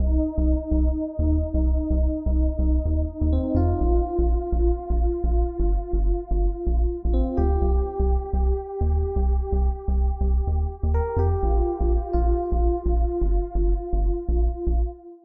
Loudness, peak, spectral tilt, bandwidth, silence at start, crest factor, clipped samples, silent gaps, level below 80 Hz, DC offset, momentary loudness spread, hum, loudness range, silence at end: -24 LUFS; -10 dBFS; -12.5 dB/octave; 2 kHz; 0 s; 10 dB; under 0.1%; none; -22 dBFS; under 0.1%; 3 LU; none; 1 LU; 0.1 s